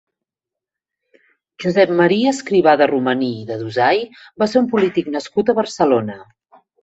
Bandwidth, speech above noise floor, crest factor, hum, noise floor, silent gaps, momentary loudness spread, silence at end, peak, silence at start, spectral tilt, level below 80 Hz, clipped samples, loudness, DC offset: 8.2 kHz; 70 dB; 16 dB; none; -86 dBFS; none; 10 LU; 0.6 s; -2 dBFS; 1.6 s; -5.5 dB/octave; -60 dBFS; under 0.1%; -17 LUFS; under 0.1%